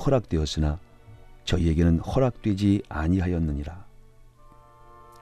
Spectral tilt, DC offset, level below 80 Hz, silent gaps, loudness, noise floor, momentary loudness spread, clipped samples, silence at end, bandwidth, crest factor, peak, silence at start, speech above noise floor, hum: -7 dB/octave; under 0.1%; -38 dBFS; none; -25 LUFS; -51 dBFS; 13 LU; under 0.1%; 0.2 s; 10 kHz; 16 dB; -10 dBFS; 0 s; 28 dB; none